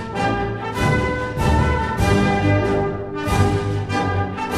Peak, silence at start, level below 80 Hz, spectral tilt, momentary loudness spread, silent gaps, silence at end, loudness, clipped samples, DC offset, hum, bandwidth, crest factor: -4 dBFS; 0 s; -30 dBFS; -6.5 dB/octave; 6 LU; none; 0 s; -20 LUFS; under 0.1%; under 0.1%; none; 13.5 kHz; 16 dB